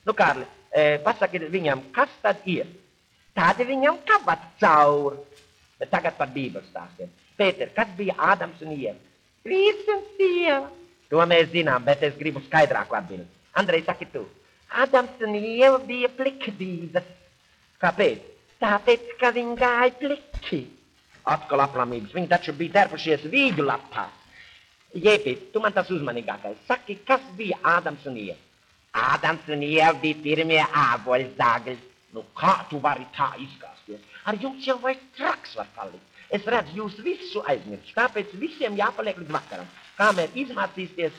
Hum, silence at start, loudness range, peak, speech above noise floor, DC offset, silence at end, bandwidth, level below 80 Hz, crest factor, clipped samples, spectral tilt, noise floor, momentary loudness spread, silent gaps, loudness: none; 0.05 s; 6 LU; -4 dBFS; 38 dB; under 0.1%; 0 s; 10.5 kHz; -58 dBFS; 20 dB; under 0.1%; -5.5 dB/octave; -61 dBFS; 16 LU; none; -24 LUFS